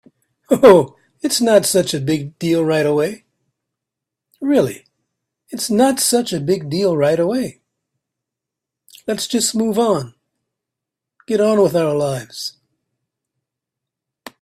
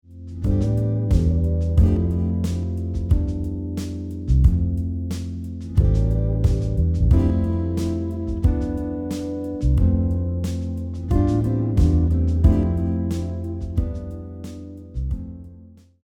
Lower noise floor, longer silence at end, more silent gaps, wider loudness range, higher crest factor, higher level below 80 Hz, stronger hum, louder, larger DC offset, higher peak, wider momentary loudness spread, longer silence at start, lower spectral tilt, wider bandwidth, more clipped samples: first, -83 dBFS vs -46 dBFS; first, 1.9 s vs 0.4 s; neither; first, 6 LU vs 3 LU; about the same, 18 dB vs 18 dB; second, -58 dBFS vs -24 dBFS; neither; first, -16 LUFS vs -22 LUFS; neither; about the same, 0 dBFS vs -2 dBFS; first, 15 LU vs 11 LU; first, 0.5 s vs 0.1 s; second, -4.5 dB/octave vs -9 dB/octave; first, 16 kHz vs 9.2 kHz; neither